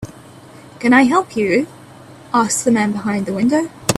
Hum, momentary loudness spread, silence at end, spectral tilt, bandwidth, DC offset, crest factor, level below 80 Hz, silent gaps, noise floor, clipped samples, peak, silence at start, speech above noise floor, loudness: none; 9 LU; 0 s; -4.5 dB/octave; 15.5 kHz; under 0.1%; 18 dB; -52 dBFS; none; -40 dBFS; under 0.1%; 0 dBFS; 0 s; 25 dB; -16 LUFS